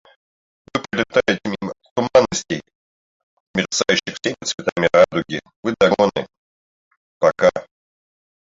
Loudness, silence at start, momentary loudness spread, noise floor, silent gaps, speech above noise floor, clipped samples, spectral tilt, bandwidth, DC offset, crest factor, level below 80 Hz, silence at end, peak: -19 LUFS; 0.75 s; 13 LU; under -90 dBFS; 1.91-1.96 s, 2.75-3.54 s, 4.54-4.58 s, 4.72-4.76 s, 5.56-5.63 s, 6.38-6.91 s, 6.97-7.20 s; over 72 dB; under 0.1%; -4 dB/octave; 7.8 kHz; under 0.1%; 20 dB; -54 dBFS; 0.95 s; -2 dBFS